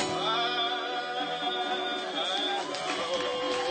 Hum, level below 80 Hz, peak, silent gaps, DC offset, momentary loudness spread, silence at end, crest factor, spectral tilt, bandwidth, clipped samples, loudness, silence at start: none; -70 dBFS; -14 dBFS; none; under 0.1%; 4 LU; 0 s; 16 dB; -2 dB/octave; 9.2 kHz; under 0.1%; -29 LUFS; 0 s